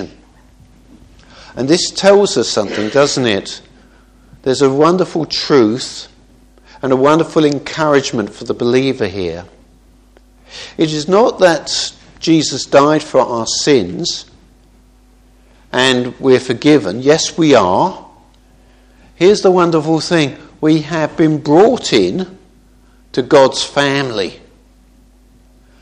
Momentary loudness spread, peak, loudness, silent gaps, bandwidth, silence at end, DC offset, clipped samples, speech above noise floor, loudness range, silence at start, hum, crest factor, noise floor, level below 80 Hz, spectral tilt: 12 LU; 0 dBFS; -13 LUFS; none; 11 kHz; 1.45 s; under 0.1%; 0.1%; 34 dB; 4 LU; 0 s; none; 14 dB; -47 dBFS; -48 dBFS; -4.5 dB/octave